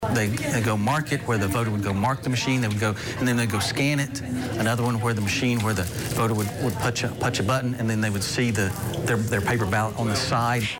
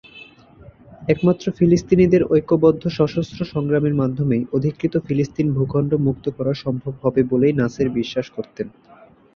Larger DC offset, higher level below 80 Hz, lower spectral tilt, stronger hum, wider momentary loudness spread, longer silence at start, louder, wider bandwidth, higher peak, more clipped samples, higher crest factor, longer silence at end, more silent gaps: neither; about the same, -48 dBFS vs -48 dBFS; second, -5 dB/octave vs -8 dB/octave; neither; second, 3 LU vs 10 LU; second, 0 s vs 0.15 s; second, -24 LUFS vs -19 LUFS; first, 17.5 kHz vs 7 kHz; second, -10 dBFS vs -2 dBFS; neither; about the same, 14 dB vs 16 dB; second, 0 s vs 0.65 s; neither